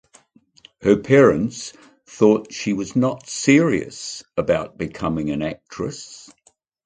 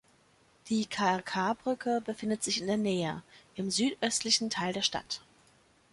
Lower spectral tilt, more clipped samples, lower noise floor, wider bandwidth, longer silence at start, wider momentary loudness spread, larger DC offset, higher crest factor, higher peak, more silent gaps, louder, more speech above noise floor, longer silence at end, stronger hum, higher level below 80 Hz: first, -5.5 dB/octave vs -3 dB/octave; neither; second, -55 dBFS vs -65 dBFS; second, 9.4 kHz vs 11.5 kHz; first, 0.8 s vs 0.65 s; first, 15 LU vs 10 LU; neither; about the same, 20 dB vs 20 dB; first, -2 dBFS vs -14 dBFS; neither; first, -20 LUFS vs -31 LUFS; about the same, 35 dB vs 34 dB; about the same, 0.65 s vs 0.75 s; neither; first, -50 dBFS vs -68 dBFS